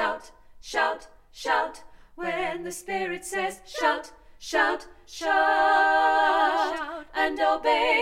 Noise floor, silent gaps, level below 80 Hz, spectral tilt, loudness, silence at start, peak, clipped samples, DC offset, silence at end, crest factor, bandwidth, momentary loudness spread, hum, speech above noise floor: -47 dBFS; none; -54 dBFS; -2 dB/octave; -25 LUFS; 0 s; -10 dBFS; under 0.1%; under 0.1%; 0 s; 16 dB; 16 kHz; 14 LU; none; 22 dB